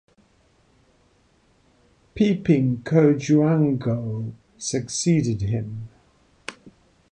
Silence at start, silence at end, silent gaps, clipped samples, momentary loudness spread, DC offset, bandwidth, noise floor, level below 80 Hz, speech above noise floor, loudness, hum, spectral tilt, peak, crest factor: 2.15 s; 0.45 s; none; under 0.1%; 20 LU; under 0.1%; 10 kHz; -61 dBFS; -52 dBFS; 40 dB; -22 LUFS; none; -6.5 dB/octave; -4 dBFS; 18 dB